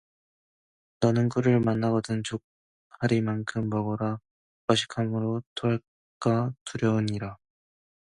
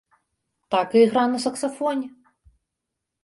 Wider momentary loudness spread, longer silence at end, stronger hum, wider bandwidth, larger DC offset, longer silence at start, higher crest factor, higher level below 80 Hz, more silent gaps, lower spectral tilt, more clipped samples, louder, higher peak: about the same, 9 LU vs 10 LU; second, 0.75 s vs 1.15 s; neither; about the same, 11 kHz vs 11.5 kHz; neither; first, 1 s vs 0.7 s; about the same, 20 dB vs 18 dB; first, -60 dBFS vs -66 dBFS; first, 2.44-2.90 s, 4.31-4.68 s, 5.46-5.56 s, 5.88-6.21 s, 6.61-6.66 s vs none; first, -6.5 dB/octave vs -4.5 dB/octave; neither; second, -28 LUFS vs -22 LUFS; about the same, -8 dBFS vs -6 dBFS